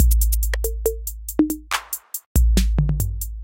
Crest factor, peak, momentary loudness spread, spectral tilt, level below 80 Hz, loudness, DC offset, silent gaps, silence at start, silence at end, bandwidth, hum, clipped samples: 16 dB; -4 dBFS; 8 LU; -5 dB/octave; -22 dBFS; -22 LUFS; under 0.1%; 2.26-2.35 s; 0 s; 0 s; 17 kHz; none; under 0.1%